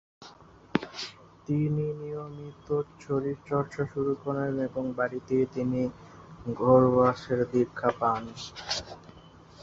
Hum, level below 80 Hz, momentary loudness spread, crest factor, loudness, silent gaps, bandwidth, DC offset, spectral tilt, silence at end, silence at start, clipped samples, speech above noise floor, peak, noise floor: none; -58 dBFS; 17 LU; 22 dB; -29 LUFS; none; 7.8 kHz; under 0.1%; -6.5 dB/octave; 0 s; 0.2 s; under 0.1%; 24 dB; -8 dBFS; -52 dBFS